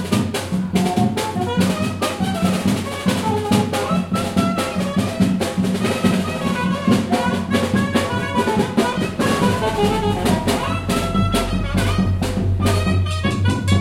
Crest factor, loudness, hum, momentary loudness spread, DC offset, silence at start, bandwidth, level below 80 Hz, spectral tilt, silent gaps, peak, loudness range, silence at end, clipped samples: 16 dB; -19 LUFS; none; 3 LU; under 0.1%; 0 s; 16.5 kHz; -36 dBFS; -5.5 dB/octave; none; -2 dBFS; 1 LU; 0 s; under 0.1%